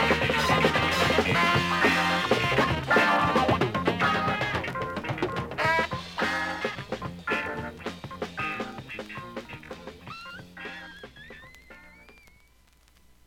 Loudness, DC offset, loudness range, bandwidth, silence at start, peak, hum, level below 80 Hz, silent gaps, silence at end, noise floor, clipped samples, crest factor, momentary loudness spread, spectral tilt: -25 LUFS; under 0.1%; 19 LU; 17 kHz; 0 s; -8 dBFS; none; -50 dBFS; none; 1.15 s; -60 dBFS; under 0.1%; 20 dB; 19 LU; -4.5 dB/octave